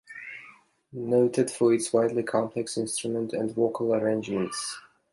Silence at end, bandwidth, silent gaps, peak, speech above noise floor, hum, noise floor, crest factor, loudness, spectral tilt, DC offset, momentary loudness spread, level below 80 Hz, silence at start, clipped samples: 0.35 s; 11.5 kHz; none; -10 dBFS; 28 dB; none; -54 dBFS; 18 dB; -27 LUFS; -5 dB/octave; under 0.1%; 16 LU; -70 dBFS; 0.1 s; under 0.1%